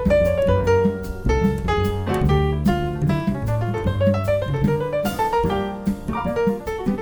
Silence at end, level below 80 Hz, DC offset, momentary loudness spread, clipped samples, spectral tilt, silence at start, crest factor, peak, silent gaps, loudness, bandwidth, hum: 0 s; -30 dBFS; under 0.1%; 6 LU; under 0.1%; -7.5 dB/octave; 0 s; 14 dB; -6 dBFS; none; -21 LUFS; over 20 kHz; none